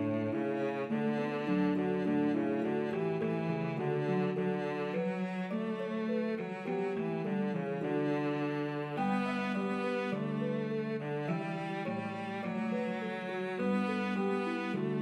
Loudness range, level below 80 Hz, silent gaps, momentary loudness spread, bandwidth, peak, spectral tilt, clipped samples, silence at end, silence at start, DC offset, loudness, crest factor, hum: 3 LU; -84 dBFS; none; 5 LU; 10.5 kHz; -20 dBFS; -8 dB/octave; under 0.1%; 0 s; 0 s; under 0.1%; -34 LUFS; 12 dB; none